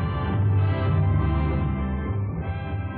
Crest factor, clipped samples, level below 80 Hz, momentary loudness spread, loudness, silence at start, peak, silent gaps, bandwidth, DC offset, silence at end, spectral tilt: 12 dB; under 0.1%; -32 dBFS; 7 LU; -25 LUFS; 0 s; -12 dBFS; none; 4.3 kHz; under 0.1%; 0 s; -8 dB/octave